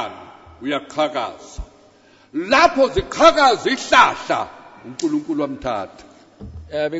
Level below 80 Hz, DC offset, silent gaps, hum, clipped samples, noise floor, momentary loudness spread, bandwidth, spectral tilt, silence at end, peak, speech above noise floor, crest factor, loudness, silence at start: -44 dBFS; under 0.1%; none; none; under 0.1%; -51 dBFS; 22 LU; 8 kHz; -3.5 dB/octave; 0 s; 0 dBFS; 33 dB; 20 dB; -18 LUFS; 0 s